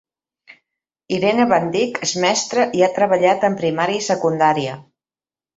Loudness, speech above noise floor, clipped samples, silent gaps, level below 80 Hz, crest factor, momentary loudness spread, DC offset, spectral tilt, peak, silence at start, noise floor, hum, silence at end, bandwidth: -18 LUFS; over 73 dB; under 0.1%; none; -62 dBFS; 16 dB; 5 LU; under 0.1%; -4 dB/octave; -2 dBFS; 1.1 s; under -90 dBFS; none; 0.75 s; 8.2 kHz